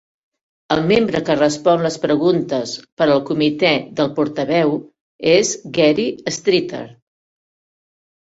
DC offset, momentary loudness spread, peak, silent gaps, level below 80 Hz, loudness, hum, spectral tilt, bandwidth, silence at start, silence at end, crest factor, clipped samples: under 0.1%; 7 LU; -2 dBFS; 2.92-2.97 s, 5.01-5.19 s; -56 dBFS; -17 LUFS; none; -4.5 dB/octave; 8 kHz; 0.7 s; 1.4 s; 16 dB; under 0.1%